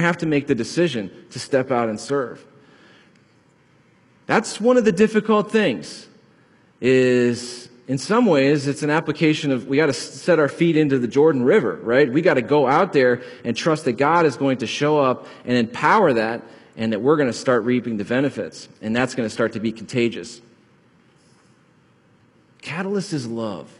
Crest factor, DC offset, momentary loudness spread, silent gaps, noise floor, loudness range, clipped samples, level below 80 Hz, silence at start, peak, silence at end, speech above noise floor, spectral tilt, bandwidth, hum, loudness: 18 dB; under 0.1%; 12 LU; none; -57 dBFS; 9 LU; under 0.1%; -62 dBFS; 0 s; -2 dBFS; 0.15 s; 37 dB; -5.5 dB/octave; 11.5 kHz; none; -20 LUFS